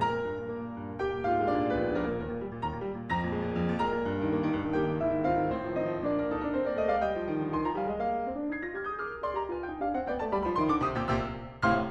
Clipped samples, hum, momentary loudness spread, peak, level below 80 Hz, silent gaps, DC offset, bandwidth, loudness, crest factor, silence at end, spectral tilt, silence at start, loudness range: under 0.1%; none; 7 LU; -12 dBFS; -50 dBFS; none; under 0.1%; 8 kHz; -31 LUFS; 18 dB; 0 s; -8 dB/octave; 0 s; 2 LU